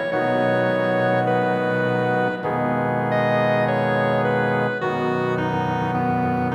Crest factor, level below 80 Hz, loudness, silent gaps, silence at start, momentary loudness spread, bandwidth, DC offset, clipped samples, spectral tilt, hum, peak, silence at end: 12 dB; -60 dBFS; -21 LUFS; none; 0 s; 3 LU; 13.5 kHz; under 0.1%; under 0.1%; -8 dB/octave; none; -8 dBFS; 0 s